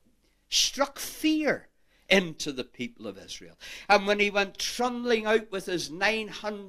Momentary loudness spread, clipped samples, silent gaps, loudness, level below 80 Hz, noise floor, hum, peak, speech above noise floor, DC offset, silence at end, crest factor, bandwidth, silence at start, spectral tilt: 16 LU; under 0.1%; none; -27 LUFS; -56 dBFS; -66 dBFS; none; -6 dBFS; 38 dB; under 0.1%; 0 s; 22 dB; 15.5 kHz; 0.5 s; -2.5 dB/octave